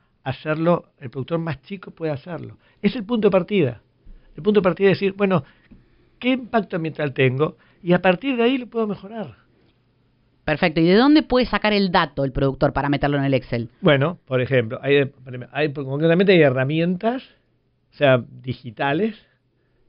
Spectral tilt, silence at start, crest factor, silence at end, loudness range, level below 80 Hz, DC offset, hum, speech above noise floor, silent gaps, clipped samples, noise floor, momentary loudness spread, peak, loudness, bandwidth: -5 dB/octave; 0.25 s; 18 dB; 0.75 s; 5 LU; -46 dBFS; under 0.1%; none; 45 dB; none; under 0.1%; -65 dBFS; 15 LU; -4 dBFS; -20 LUFS; 5.6 kHz